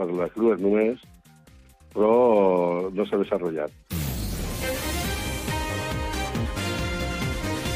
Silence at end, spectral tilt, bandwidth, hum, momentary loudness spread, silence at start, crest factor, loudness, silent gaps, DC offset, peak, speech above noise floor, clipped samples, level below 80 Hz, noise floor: 0 s; -5.5 dB/octave; 16 kHz; none; 10 LU; 0 s; 16 dB; -25 LUFS; none; under 0.1%; -8 dBFS; 30 dB; under 0.1%; -38 dBFS; -52 dBFS